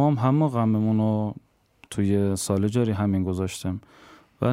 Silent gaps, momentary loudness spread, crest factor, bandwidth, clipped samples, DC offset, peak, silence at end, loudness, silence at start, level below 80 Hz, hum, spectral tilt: none; 11 LU; 16 dB; 16 kHz; under 0.1%; under 0.1%; -8 dBFS; 0 s; -24 LUFS; 0 s; -60 dBFS; none; -7 dB/octave